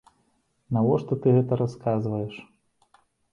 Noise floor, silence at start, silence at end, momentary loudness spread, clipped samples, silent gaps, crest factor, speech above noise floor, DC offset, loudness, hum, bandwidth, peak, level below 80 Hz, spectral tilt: -69 dBFS; 0.7 s; 0.9 s; 11 LU; under 0.1%; none; 18 dB; 46 dB; under 0.1%; -25 LUFS; none; 6.8 kHz; -8 dBFS; -60 dBFS; -10 dB/octave